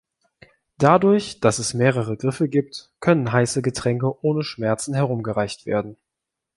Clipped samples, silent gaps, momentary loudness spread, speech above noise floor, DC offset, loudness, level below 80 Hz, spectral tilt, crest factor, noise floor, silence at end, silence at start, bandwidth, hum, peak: under 0.1%; none; 8 LU; 63 dB; under 0.1%; -21 LUFS; -56 dBFS; -5.5 dB/octave; 20 dB; -84 dBFS; 0.65 s; 0.8 s; 11.5 kHz; none; -2 dBFS